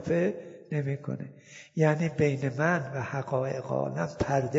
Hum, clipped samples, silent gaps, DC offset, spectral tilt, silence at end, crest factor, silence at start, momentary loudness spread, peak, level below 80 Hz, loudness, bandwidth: none; under 0.1%; none; under 0.1%; -7.5 dB/octave; 0 s; 20 dB; 0 s; 12 LU; -10 dBFS; -58 dBFS; -30 LUFS; 7.8 kHz